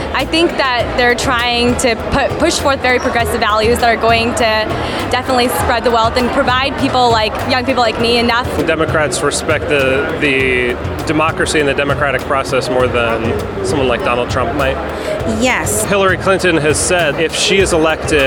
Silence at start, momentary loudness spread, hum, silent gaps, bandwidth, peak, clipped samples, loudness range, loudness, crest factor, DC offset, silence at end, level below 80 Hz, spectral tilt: 0 s; 4 LU; none; none; 19.5 kHz; 0 dBFS; under 0.1%; 2 LU; -13 LUFS; 14 dB; under 0.1%; 0 s; -30 dBFS; -4 dB/octave